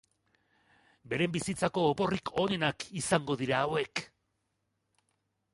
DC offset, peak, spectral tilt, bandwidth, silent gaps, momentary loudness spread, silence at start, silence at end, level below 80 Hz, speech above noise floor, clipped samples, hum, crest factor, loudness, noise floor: under 0.1%; -12 dBFS; -4.5 dB/octave; 11.5 kHz; none; 7 LU; 1.05 s; 1.5 s; -64 dBFS; 49 dB; under 0.1%; none; 22 dB; -31 LUFS; -80 dBFS